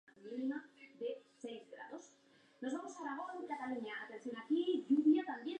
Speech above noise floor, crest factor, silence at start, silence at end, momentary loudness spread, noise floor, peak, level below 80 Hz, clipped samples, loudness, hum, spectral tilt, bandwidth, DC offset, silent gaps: 29 dB; 18 dB; 0.2 s; 0 s; 18 LU; -69 dBFS; -22 dBFS; under -90 dBFS; under 0.1%; -39 LUFS; none; -4.5 dB/octave; 8.8 kHz; under 0.1%; none